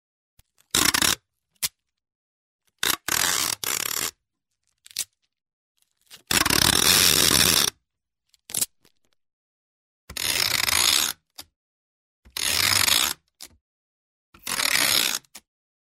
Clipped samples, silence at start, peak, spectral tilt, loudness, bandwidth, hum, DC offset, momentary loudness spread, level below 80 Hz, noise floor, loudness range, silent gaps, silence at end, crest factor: under 0.1%; 0.75 s; -2 dBFS; -0.5 dB/octave; -20 LUFS; 16.5 kHz; none; under 0.1%; 16 LU; -50 dBFS; -83 dBFS; 7 LU; 2.15-2.59 s, 5.53-5.75 s, 9.33-10.08 s, 11.56-12.23 s, 13.61-14.33 s; 0.55 s; 24 dB